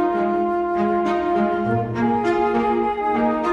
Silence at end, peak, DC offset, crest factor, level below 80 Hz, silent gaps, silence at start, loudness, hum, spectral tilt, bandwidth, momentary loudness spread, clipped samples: 0 s; -8 dBFS; under 0.1%; 12 dB; -48 dBFS; none; 0 s; -20 LUFS; none; -8 dB/octave; 7.8 kHz; 2 LU; under 0.1%